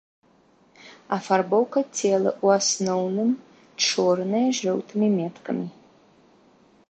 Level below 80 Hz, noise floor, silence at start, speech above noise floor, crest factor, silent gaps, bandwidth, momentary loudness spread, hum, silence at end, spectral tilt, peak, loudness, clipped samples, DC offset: -74 dBFS; -59 dBFS; 0.85 s; 36 dB; 18 dB; none; 8.8 kHz; 10 LU; none; 1.2 s; -4 dB/octave; -6 dBFS; -23 LUFS; under 0.1%; under 0.1%